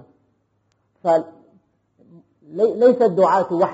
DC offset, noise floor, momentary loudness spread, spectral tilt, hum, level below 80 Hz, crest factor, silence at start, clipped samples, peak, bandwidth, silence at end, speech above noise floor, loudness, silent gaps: under 0.1%; -67 dBFS; 14 LU; -6 dB/octave; none; -72 dBFS; 16 dB; 1.05 s; under 0.1%; -4 dBFS; 8 kHz; 0 s; 50 dB; -18 LUFS; none